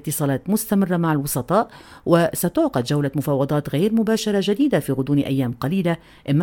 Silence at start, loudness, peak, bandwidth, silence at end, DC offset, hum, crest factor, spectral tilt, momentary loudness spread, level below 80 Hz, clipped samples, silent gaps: 0.05 s; -21 LUFS; -4 dBFS; 17.5 kHz; 0 s; under 0.1%; none; 16 dB; -6 dB/octave; 4 LU; -52 dBFS; under 0.1%; none